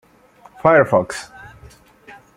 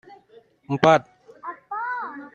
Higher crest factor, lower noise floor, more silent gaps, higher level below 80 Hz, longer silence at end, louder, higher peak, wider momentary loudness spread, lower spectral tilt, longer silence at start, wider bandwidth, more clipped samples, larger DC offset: about the same, 18 dB vs 22 dB; second, -49 dBFS vs -54 dBFS; neither; first, -54 dBFS vs -64 dBFS; first, 1.15 s vs 0.05 s; first, -16 LUFS vs -22 LUFS; about the same, -2 dBFS vs -2 dBFS; about the same, 18 LU vs 20 LU; about the same, -6 dB/octave vs -6 dB/octave; first, 0.65 s vs 0.1 s; first, 13 kHz vs 9 kHz; neither; neither